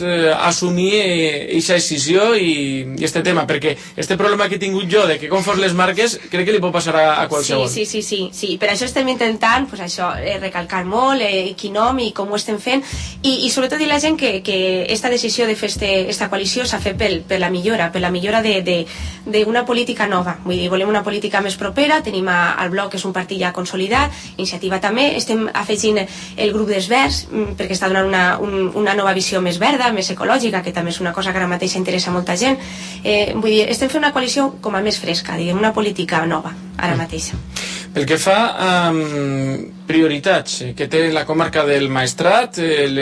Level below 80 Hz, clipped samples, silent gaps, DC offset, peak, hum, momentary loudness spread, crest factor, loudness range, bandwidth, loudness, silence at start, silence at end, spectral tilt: -42 dBFS; under 0.1%; none; under 0.1%; -2 dBFS; none; 7 LU; 16 dB; 2 LU; 11 kHz; -17 LUFS; 0 s; 0 s; -4 dB/octave